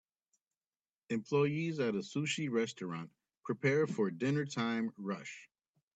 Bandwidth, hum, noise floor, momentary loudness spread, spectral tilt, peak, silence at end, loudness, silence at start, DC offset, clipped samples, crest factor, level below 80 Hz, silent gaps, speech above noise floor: 9 kHz; none; under -90 dBFS; 12 LU; -6 dB/octave; -18 dBFS; 0.5 s; -36 LUFS; 1.1 s; under 0.1%; under 0.1%; 18 dB; -80 dBFS; none; over 55 dB